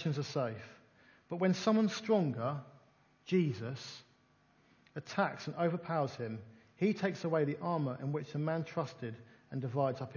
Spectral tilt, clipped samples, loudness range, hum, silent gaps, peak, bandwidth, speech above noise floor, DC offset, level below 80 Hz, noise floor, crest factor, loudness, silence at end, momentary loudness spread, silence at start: -7 dB/octave; under 0.1%; 4 LU; none; none; -16 dBFS; 7.2 kHz; 34 dB; under 0.1%; -76 dBFS; -69 dBFS; 20 dB; -36 LUFS; 0 s; 15 LU; 0 s